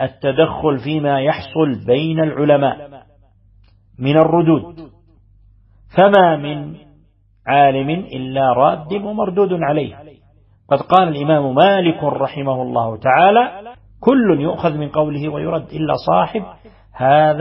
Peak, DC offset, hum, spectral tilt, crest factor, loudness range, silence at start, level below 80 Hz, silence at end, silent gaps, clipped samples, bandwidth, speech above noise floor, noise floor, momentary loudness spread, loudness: 0 dBFS; under 0.1%; none; -9.5 dB/octave; 16 dB; 3 LU; 0 s; -50 dBFS; 0 s; none; under 0.1%; 5.8 kHz; 38 dB; -53 dBFS; 10 LU; -16 LUFS